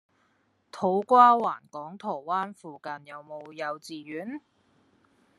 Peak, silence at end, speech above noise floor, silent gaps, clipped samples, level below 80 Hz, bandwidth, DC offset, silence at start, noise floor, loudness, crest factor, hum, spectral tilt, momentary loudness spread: -4 dBFS; 1 s; 43 dB; none; under 0.1%; -82 dBFS; 12 kHz; under 0.1%; 0.75 s; -70 dBFS; -25 LUFS; 24 dB; none; -6 dB/octave; 24 LU